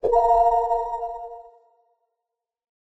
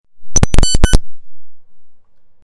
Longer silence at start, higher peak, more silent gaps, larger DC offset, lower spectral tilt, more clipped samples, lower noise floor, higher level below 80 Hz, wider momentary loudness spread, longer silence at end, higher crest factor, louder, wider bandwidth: about the same, 0.05 s vs 0.15 s; second, -8 dBFS vs 0 dBFS; neither; neither; first, -6 dB/octave vs -3.5 dB/octave; neither; first, -85 dBFS vs -37 dBFS; second, -46 dBFS vs -16 dBFS; first, 18 LU vs 5 LU; first, 1.4 s vs 0.45 s; first, 16 dB vs 10 dB; second, -21 LUFS vs -15 LUFS; second, 8 kHz vs 11.5 kHz